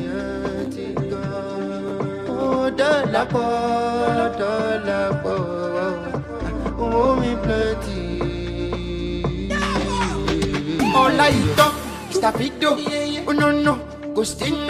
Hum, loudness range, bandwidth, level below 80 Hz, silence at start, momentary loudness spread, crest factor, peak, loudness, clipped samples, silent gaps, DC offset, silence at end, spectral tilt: none; 4 LU; 15.5 kHz; -36 dBFS; 0 s; 10 LU; 20 dB; -2 dBFS; -21 LUFS; under 0.1%; none; under 0.1%; 0 s; -5.5 dB/octave